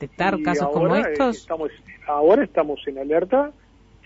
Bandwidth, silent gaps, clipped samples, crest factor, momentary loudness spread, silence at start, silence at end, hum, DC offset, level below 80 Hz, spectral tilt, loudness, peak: 8 kHz; none; under 0.1%; 16 dB; 12 LU; 0 s; 0.55 s; none; under 0.1%; -52 dBFS; -6.5 dB/octave; -21 LUFS; -6 dBFS